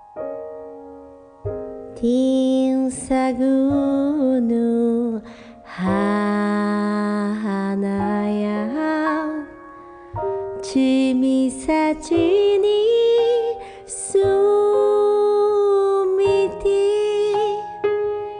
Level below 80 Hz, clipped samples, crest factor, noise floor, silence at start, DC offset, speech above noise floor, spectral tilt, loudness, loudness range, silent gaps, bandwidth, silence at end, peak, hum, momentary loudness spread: -50 dBFS; under 0.1%; 10 dB; -42 dBFS; 0.15 s; under 0.1%; 24 dB; -6 dB/octave; -19 LUFS; 5 LU; none; 10 kHz; 0 s; -8 dBFS; none; 14 LU